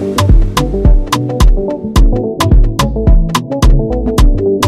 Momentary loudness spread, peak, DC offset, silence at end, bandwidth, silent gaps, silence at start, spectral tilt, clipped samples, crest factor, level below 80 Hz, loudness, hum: 3 LU; 0 dBFS; under 0.1%; 0 s; 13.5 kHz; none; 0 s; -6 dB/octave; under 0.1%; 8 dB; -10 dBFS; -12 LUFS; none